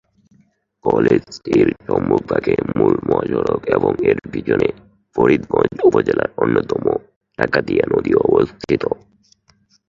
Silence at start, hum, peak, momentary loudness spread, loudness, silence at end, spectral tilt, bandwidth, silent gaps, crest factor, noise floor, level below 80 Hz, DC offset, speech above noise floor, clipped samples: 0.85 s; none; 0 dBFS; 7 LU; -17 LUFS; 0.95 s; -8 dB/octave; 7.4 kHz; 7.16-7.21 s; 18 dB; -58 dBFS; -46 dBFS; under 0.1%; 41 dB; under 0.1%